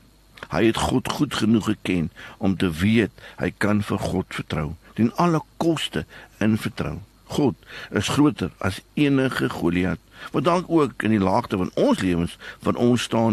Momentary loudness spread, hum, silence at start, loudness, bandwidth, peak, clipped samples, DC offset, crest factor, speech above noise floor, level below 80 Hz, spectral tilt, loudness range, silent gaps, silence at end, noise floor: 9 LU; none; 0.4 s; -23 LUFS; 13 kHz; -6 dBFS; under 0.1%; under 0.1%; 16 dB; 22 dB; -46 dBFS; -6 dB/octave; 3 LU; none; 0 s; -44 dBFS